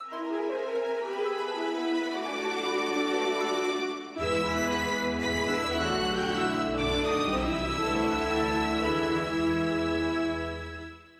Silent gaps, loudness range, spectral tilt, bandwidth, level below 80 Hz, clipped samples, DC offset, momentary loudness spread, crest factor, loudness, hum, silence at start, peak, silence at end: none; 2 LU; -4.5 dB/octave; 14.5 kHz; -46 dBFS; under 0.1%; under 0.1%; 4 LU; 14 dB; -29 LUFS; none; 0 s; -16 dBFS; 0.15 s